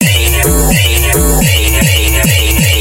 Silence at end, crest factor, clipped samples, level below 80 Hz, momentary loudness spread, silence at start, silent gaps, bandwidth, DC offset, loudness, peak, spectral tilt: 0 s; 8 dB; 0.2%; -14 dBFS; 1 LU; 0 s; none; 17.5 kHz; under 0.1%; -9 LUFS; 0 dBFS; -3.5 dB/octave